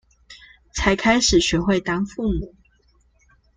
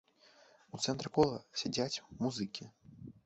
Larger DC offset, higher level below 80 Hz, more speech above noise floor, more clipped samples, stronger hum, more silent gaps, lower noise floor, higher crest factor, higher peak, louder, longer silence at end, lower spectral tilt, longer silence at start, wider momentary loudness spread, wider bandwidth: neither; first, -36 dBFS vs -68 dBFS; first, 40 dB vs 29 dB; neither; neither; neither; second, -60 dBFS vs -64 dBFS; about the same, 20 dB vs 22 dB; first, -2 dBFS vs -16 dBFS; first, -20 LUFS vs -36 LUFS; first, 1.1 s vs 0.15 s; about the same, -4 dB/octave vs -4.5 dB/octave; second, 0.3 s vs 0.75 s; second, 13 LU vs 21 LU; first, 9.6 kHz vs 8 kHz